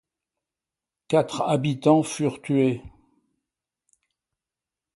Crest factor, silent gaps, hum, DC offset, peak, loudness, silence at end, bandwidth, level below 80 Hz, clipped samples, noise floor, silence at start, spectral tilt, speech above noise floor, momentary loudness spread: 20 dB; none; none; under 0.1%; -6 dBFS; -23 LUFS; 2.05 s; 11.5 kHz; -62 dBFS; under 0.1%; -89 dBFS; 1.1 s; -6.5 dB/octave; 67 dB; 7 LU